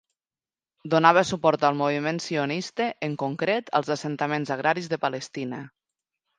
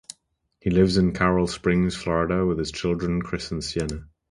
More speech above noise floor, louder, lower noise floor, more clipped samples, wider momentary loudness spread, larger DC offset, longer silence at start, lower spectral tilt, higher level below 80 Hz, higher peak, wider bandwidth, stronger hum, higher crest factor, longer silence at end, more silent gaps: first, over 65 dB vs 45 dB; about the same, -25 LUFS vs -24 LUFS; first, under -90 dBFS vs -68 dBFS; neither; first, 13 LU vs 10 LU; neither; first, 0.85 s vs 0.65 s; about the same, -5 dB/octave vs -6 dB/octave; second, -68 dBFS vs -40 dBFS; first, -2 dBFS vs -6 dBFS; second, 9.8 kHz vs 11.5 kHz; neither; first, 24 dB vs 18 dB; first, 0.7 s vs 0.25 s; neither